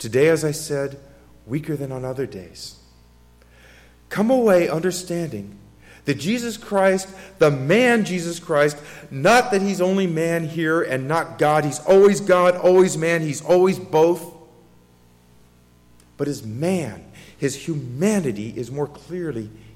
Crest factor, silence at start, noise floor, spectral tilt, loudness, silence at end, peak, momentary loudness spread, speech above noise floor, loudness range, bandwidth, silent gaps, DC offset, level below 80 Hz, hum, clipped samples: 16 dB; 0 s; -53 dBFS; -5.5 dB/octave; -20 LUFS; 0.25 s; -6 dBFS; 15 LU; 33 dB; 11 LU; 16 kHz; none; under 0.1%; -54 dBFS; 60 Hz at -50 dBFS; under 0.1%